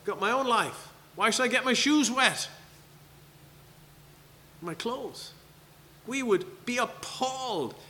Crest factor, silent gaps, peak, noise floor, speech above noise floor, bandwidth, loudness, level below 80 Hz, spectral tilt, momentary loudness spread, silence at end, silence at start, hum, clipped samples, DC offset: 24 dB; none; -6 dBFS; -55 dBFS; 26 dB; 19 kHz; -28 LUFS; -66 dBFS; -2.5 dB/octave; 18 LU; 0 s; 0.05 s; none; under 0.1%; under 0.1%